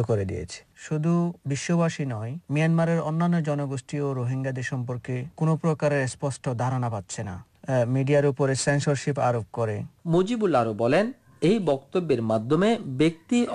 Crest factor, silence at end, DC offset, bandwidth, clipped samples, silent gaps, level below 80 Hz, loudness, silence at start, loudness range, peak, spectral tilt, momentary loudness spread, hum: 12 dB; 0 s; under 0.1%; 10.5 kHz; under 0.1%; none; -58 dBFS; -25 LUFS; 0 s; 3 LU; -12 dBFS; -6.5 dB/octave; 9 LU; none